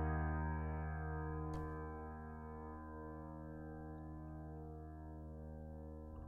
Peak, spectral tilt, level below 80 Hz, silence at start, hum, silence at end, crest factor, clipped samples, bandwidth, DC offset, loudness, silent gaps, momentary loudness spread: -30 dBFS; -10 dB/octave; -50 dBFS; 0 s; none; 0 s; 16 dB; under 0.1%; 2.6 kHz; under 0.1%; -48 LUFS; none; 10 LU